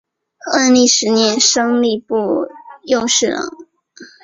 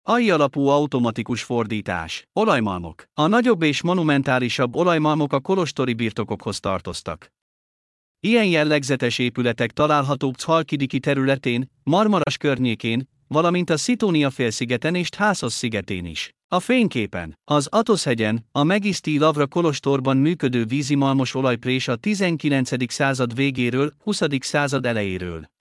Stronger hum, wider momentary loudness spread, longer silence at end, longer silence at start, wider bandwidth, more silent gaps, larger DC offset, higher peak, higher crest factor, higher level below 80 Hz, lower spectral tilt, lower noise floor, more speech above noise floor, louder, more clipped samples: neither; first, 13 LU vs 8 LU; about the same, 0.2 s vs 0.2 s; first, 0.45 s vs 0.05 s; second, 7.8 kHz vs 12 kHz; second, none vs 7.42-8.15 s, 16.44-16.49 s; neither; first, 0 dBFS vs -4 dBFS; about the same, 16 dB vs 16 dB; about the same, -58 dBFS vs -58 dBFS; second, -2 dB/octave vs -5.5 dB/octave; second, -42 dBFS vs under -90 dBFS; second, 27 dB vs over 69 dB; first, -14 LUFS vs -21 LUFS; neither